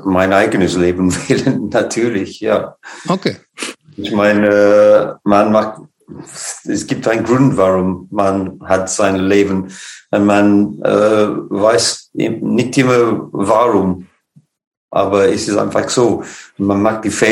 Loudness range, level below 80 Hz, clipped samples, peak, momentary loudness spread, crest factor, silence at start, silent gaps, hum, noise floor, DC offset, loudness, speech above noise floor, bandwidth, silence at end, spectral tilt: 3 LU; -56 dBFS; under 0.1%; 0 dBFS; 11 LU; 14 dB; 0 s; 14.67-14.71 s, 14.77-14.88 s; none; -52 dBFS; under 0.1%; -14 LUFS; 38 dB; 15.5 kHz; 0 s; -5 dB/octave